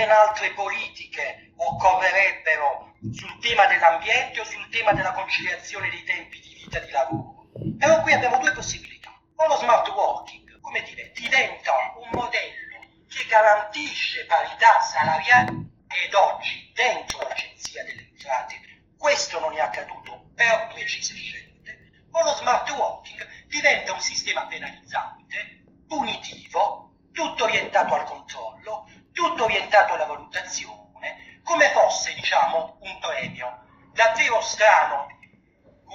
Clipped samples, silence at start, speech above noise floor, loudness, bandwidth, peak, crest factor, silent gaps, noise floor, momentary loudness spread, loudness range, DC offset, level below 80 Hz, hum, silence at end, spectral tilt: under 0.1%; 0 s; 35 dB; -22 LUFS; 8.4 kHz; -2 dBFS; 22 dB; none; -58 dBFS; 19 LU; 6 LU; under 0.1%; -58 dBFS; none; 0 s; -2 dB/octave